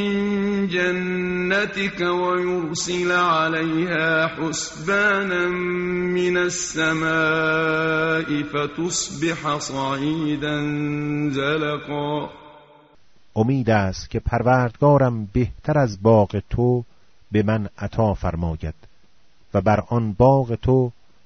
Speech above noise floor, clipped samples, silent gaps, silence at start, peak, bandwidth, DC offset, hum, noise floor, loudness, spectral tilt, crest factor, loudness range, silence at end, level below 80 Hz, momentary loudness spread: 39 dB; under 0.1%; none; 0 s; -4 dBFS; 8 kHz; under 0.1%; none; -59 dBFS; -21 LUFS; -5 dB/octave; 18 dB; 4 LU; 0.35 s; -42 dBFS; 8 LU